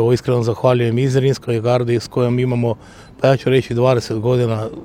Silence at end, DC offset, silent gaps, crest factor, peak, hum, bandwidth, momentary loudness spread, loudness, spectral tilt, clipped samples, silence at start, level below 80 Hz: 0 s; under 0.1%; none; 16 dB; 0 dBFS; none; 12.5 kHz; 4 LU; -17 LUFS; -7 dB/octave; under 0.1%; 0 s; -48 dBFS